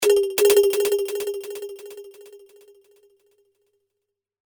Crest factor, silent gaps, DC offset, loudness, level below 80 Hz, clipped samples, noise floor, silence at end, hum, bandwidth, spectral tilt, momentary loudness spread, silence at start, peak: 18 dB; none; under 0.1%; -20 LUFS; -68 dBFS; under 0.1%; -82 dBFS; 2.2 s; none; over 20 kHz; -1 dB/octave; 24 LU; 0 s; -6 dBFS